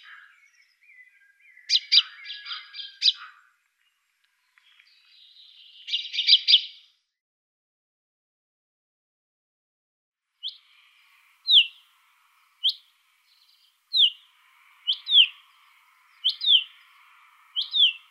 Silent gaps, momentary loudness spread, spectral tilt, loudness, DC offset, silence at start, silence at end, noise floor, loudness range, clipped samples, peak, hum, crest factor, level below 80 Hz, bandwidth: 7.21-10.12 s; 20 LU; 11.5 dB/octave; -20 LUFS; under 0.1%; 1.7 s; 0.15 s; -71 dBFS; 9 LU; under 0.1%; -4 dBFS; none; 24 dB; under -90 dBFS; 15 kHz